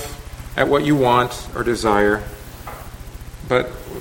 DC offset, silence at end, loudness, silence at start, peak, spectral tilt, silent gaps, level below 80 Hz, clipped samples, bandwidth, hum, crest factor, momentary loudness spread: under 0.1%; 0 s; -19 LUFS; 0 s; 0 dBFS; -5.5 dB/octave; none; -36 dBFS; under 0.1%; 17 kHz; none; 20 dB; 20 LU